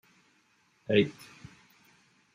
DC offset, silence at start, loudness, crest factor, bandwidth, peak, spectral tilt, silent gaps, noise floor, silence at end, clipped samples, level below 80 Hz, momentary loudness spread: under 0.1%; 0.9 s; -28 LUFS; 22 dB; 15.5 kHz; -12 dBFS; -6.5 dB/octave; none; -68 dBFS; 1.25 s; under 0.1%; -72 dBFS; 26 LU